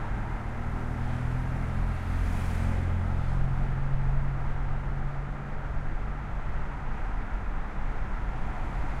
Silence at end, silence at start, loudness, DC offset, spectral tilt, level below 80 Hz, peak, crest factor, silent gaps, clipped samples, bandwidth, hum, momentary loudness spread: 0 s; 0 s; -33 LUFS; under 0.1%; -8 dB/octave; -30 dBFS; -14 dBFS; 14 dB; none; under 0.1%; 7.6 kHz; none; 6 LU